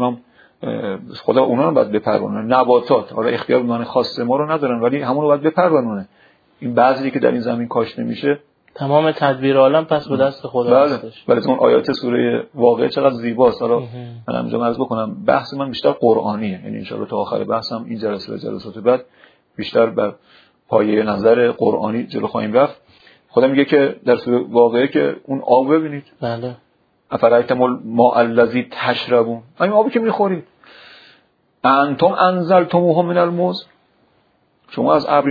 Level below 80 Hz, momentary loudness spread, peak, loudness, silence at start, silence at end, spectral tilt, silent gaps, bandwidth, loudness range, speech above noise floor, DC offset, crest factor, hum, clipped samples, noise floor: -62 dBFS; 11 LU; 0 dBFS; -17 LUFS; 0 s; 0 s; -8.5 dB/octave; none; 5 kHz; 4 LU; 43 dB; under 0.1%; 16 dB; none; under 0.1%; -60 dBFS